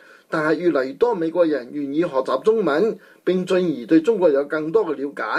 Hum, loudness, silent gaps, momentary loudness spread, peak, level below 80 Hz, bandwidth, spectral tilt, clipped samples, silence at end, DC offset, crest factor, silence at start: none; -20 LUFS; none; 8 LU; -6 dBFS; -66 dBFS; 10.5 kHz; -7 dB/octave; under 0.1%; 0 s; under 0.1%; 14 dB; 0.3 s